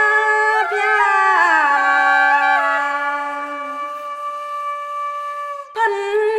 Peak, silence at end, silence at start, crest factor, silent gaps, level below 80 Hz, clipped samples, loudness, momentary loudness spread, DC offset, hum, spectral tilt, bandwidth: -2 dBFS; 0 s; 0 s; 16 dB; none; -74 dBFS; under 0.1%; -17 LUFS; 13 LU; under 0.1%; none; 0 dB/octave; 13.5 kHz